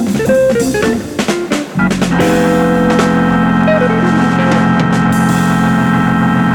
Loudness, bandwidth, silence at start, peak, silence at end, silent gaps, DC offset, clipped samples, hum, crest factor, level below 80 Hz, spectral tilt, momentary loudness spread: -12 LUFS; 18 kHz; 0 s; 0 dBFS; 0 s; none; under 0.1%; under 0.1%; none; 10 dB; -36 dBFS; -6 dB/octave; 4 LU